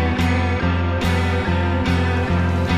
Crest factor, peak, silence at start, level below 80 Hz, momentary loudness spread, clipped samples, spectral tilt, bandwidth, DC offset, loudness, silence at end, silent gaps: 12 dB; -6 dBFS; 0 s; -30 dBFS; 1 LU; under 0.1%; -7 dB/octave; 11 kHz; under 0.1%; -19 LUFS; 0 s; none